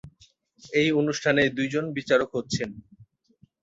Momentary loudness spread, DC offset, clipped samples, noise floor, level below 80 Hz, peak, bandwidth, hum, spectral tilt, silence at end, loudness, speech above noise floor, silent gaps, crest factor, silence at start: 8 LU; under 0.1%; under 0.1%; -62 dBFS; -60 dBFS; -8 dBFS; 8 kHz; none; -5 dB/octave; 0.6 s; -25 LUFS; 37 dB; none; 18 dB; 0.05 s